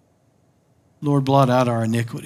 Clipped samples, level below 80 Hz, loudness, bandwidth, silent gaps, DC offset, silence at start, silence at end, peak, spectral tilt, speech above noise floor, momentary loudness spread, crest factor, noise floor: under 0.1%; -70 dBFS; -19 LUFS; 15.5 kHz; none; under 0.1%; 1 s; 0 s; -2 dBFS; -7.5 dB/octave; 42 dB; 7 LU; 18 dB; -60 dBFS